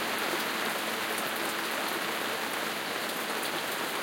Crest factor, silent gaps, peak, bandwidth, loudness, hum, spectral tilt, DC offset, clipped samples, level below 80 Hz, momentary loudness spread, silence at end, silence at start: 16 dB; none; -16 dBFS; 17 kHz; -31 LUFS; none; -1.5 dB/octave; under 0.1%; under 0.1%; -80 dBFS; 2 LU; 0 s; 0 s